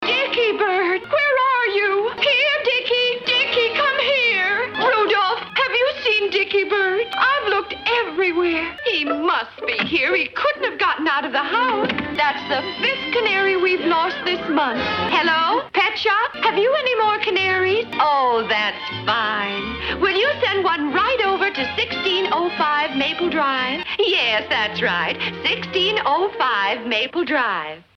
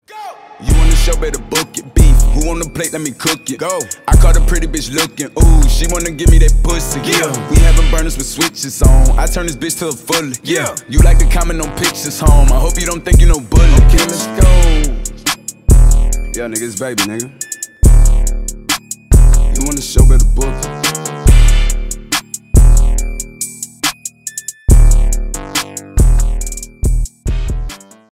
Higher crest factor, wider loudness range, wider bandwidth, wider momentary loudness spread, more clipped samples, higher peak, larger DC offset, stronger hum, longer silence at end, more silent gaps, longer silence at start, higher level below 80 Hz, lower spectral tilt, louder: about the same, 14 dB vs 10 dB; about the same, 2 LU vs 4 LU; second, 7.4 kHz vs 15.5 kHz; second, 4 LU vs 11 LU; neither; second, -6 dBFS vs 0 dBFS; neither; neither; second, 0.15 s vs 0.4 s; neither; second, 0 s vs 0.15 s; second, -54 dBFS vs -10 dBFS; about the same, -4.5 dB/octave vs -4.5 dB/octave; second, -19 LUFS vs -14 LUFS